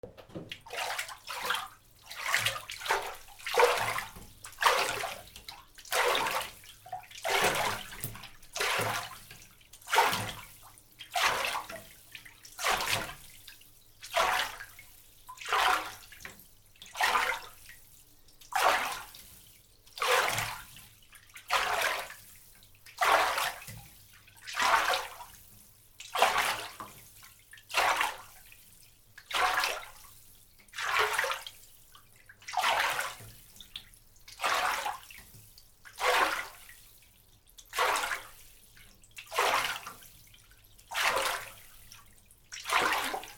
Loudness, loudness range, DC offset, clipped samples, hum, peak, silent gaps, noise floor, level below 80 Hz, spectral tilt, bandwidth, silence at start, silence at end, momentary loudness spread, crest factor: -30 LUFS; 3 LU; under 0.1%; under 0.1%; none; -8 dBFS; none; -61 dBFS; -60 dBFS; -1 dB/octave; over 20 kHz; 0.05 s; 0 s; 23 LU; 26 dB